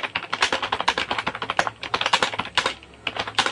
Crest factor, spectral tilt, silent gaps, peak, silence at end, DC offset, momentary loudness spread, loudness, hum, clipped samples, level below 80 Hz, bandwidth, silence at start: 22 dB; -1.5 dB/octave; none; -4 dBFS; 0 s; under 0.1%; 7 LU; -24 LUFS; none; under 0.1%; -54 dBFS; 11.5 kHz; 0 s